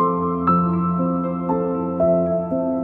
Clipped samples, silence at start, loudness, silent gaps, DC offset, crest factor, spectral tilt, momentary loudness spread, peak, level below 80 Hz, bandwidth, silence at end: under 0.1%; 0 s; -20 LUFS; none; under 0.1%; 14 dB; -13 dB/octave; 4 LU; -6 dBFS; -48 dBFS; 2.8 kHz; 0 s